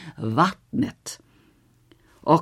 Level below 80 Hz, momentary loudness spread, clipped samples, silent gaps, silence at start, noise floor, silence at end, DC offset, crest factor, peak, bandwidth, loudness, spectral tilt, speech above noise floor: -62 dBFS; 16 LU; under 0.1%; none; 0 s; -59 dBFS; 0 s; under 0.1%; 22 dB; -4 dBFS; 15 kHz; -24 LUFS; -6 dB/octave; 35 dB